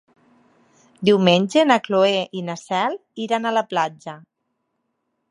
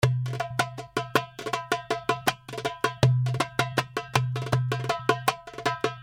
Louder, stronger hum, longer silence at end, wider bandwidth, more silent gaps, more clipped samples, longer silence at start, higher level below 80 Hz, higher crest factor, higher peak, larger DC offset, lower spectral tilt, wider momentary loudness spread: first, -20 LUFS vs -28 LUFS; neither; first, 1.15 s vs 0 s; second, 11 kHz vs 17.5 kHz; neither; neither; first, 1 s vs 0 s; second, -68 dBFS vs -54 dBFS; about the same, 20 dB vs 22 dB; about the same, -2 dBFS vs -4 dBFS; neither; about the same, -5.5 dB/octave vs -5 dB/octave; first, 13 LU vs 6 LU